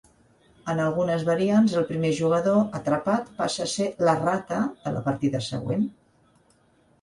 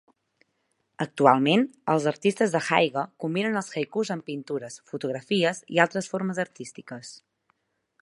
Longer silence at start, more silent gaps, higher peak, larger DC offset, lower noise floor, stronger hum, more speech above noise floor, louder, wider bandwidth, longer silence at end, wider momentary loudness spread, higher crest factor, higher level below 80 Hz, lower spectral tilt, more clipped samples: second, 0.65 s vs 1 s; neither; second, -8 dBFS vs -4 dBFS; neither; second, -62 dBFS vs -74 dBFS; neither; second, 38 dB vs 49 dB; about the same, -25 LUFS vs -25 LUFS; about the same, 11.5 kHz vs 11.5 kHz; first, 1.1 s vs 0.85 s; second, 7 LU vs 15 LU; second, 16 dB vs 24 dB; first, -60 dBFS vs -76 dBFS; about the same, -6 dB/octave vs -5 dB/octave; neither